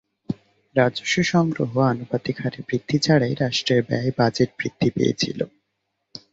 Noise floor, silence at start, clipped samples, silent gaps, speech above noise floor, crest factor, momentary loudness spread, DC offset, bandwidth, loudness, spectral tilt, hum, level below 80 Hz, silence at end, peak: -76 dBFS; 0.3 s; under 0.1%; none; 55 dB; 20 dB; 13 LU; under 0.1%; 8 kHz; -22 LUFS; -5.5 dB/octave; none; -56 dBFS; 0.15 s; -4 dBFS